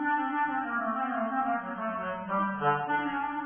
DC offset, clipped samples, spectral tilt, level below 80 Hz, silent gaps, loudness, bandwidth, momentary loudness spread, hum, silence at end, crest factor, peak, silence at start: under 0.1%; under 0.1%; -4 dB/octave; -66 dBFS; none; -30 LUFS; 3.5 kHz; 5 LU; none; 0 s; 16 dB; -14 dBFS; 0 s